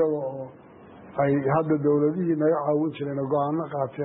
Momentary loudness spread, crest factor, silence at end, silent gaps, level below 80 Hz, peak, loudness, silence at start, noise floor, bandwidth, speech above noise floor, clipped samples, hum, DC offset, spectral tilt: 10 LU; 12 dB; 0 s; none; -64 dBFS; -12 dBFS; -25 LUFS; 0 s; -47 dBFS; 4 kHz; 22 dB; under 0.1%; none; under 0.1%; -12.5 dB/octave